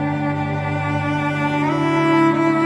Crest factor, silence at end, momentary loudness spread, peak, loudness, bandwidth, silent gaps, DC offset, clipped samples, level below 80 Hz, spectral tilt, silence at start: 14 dB; 0 s; 6 LU; -4 dBFS; -19 LUFS; 10.5 kHz; none; under 0.1%; under 0.1%; -52 dBFS; -7.5 dB/octave; 0 s